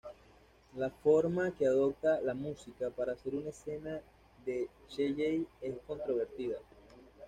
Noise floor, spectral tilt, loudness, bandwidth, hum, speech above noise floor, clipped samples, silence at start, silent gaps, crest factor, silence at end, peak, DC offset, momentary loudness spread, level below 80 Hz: -62 dBFS; -7 dB/octave; -35 LUFS; 9.8 kHz; none; 28 dB; under 0.1%; 0.05 s; none; 18 dB; 0 s; -18 dBFS; under 0.1%; 14 LU; -64 dBFS